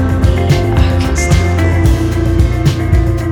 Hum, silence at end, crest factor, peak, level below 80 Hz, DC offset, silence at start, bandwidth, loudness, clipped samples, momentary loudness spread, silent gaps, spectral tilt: none; 0 s; 10 dB; 0 dBFS; -16 dBFS; 0.2%; 0 s; 14.5 kHz; -12 LUFS; under 0.1%; 2 LU; none; -6.5 dB/octave